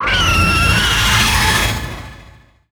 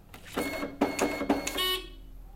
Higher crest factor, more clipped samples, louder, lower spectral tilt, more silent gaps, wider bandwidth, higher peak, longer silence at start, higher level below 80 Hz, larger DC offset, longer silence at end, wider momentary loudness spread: second, 12 dB vs 20 dB; neither; first, -13 LUFS vs -30 LUFS; about the same, -3 dB/octave vs -3 dB/octave; neither; first, over 20 kHz vs 17 kHz; first, -2 dBFS vs -12 dBFS; about the same, 0 s vs 0 s; first, -24 dBFS vs -48 dBFS; neither; first, 0.45 s vs 0 s; first, 13 LU vs 7 LU